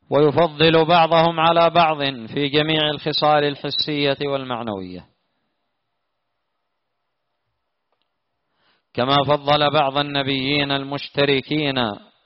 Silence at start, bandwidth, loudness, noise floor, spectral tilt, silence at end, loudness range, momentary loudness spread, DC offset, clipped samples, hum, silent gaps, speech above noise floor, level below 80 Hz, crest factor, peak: 0.1 s; 6 kHz; -18 LUFS; -77 dBFS; -3 dB/octave; 0.25 s; 12 LU; 10 LU; under 0.1%; under 0.1%; none; none; 58 dB; -56 dBFS; 16 dB; -4 dBFS